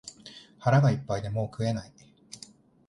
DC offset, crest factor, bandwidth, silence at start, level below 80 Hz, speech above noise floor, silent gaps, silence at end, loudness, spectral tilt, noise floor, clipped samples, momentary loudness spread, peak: under 0.1%; 18 dB; 11.5 kHz; 0.05 s; -58 dBFS; 27 dB; none; 0.5 s; -28 LUFS; -7 dB/octave; -53 dBFS; under 0.1%; 24 LU; -10 dBFS